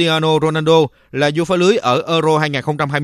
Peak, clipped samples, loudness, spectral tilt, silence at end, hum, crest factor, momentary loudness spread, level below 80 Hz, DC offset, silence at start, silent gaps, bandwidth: 0 dBFS; under 0.1%; -15 LUFS; -5.5 dB/octave; 0 s; none; 14 dB; 5 LU; -54 dBFS; under 0.1%; 0 s; none; 13.5 kHz